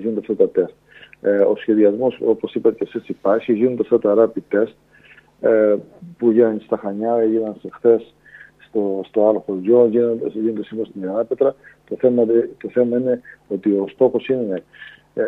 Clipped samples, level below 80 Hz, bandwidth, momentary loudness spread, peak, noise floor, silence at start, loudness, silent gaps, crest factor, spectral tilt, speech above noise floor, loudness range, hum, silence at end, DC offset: under 0.1%; -66 dBFS; 4 kHz; 10 LU; -2 dBFS; -49 dBFS; 0 s; -19 LUFS; none; 18 dB; -9.5 dB/octave; 31 dB; 2 LU; none; 0 s; under 0.1%